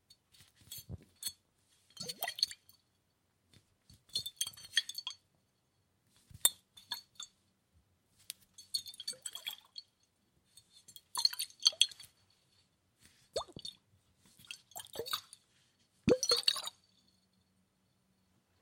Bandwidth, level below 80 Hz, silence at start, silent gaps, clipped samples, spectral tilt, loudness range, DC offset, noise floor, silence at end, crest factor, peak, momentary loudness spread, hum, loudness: 16.5 kHz; -70 dBFS; 0.7 s; none; under 0.1%; -1.5 dB/octave; 10 LU; under 0.1%; -78 dBFS; 1.9 s; 34 dB; -8 dBFS; 21 LU; none; -35 LUFS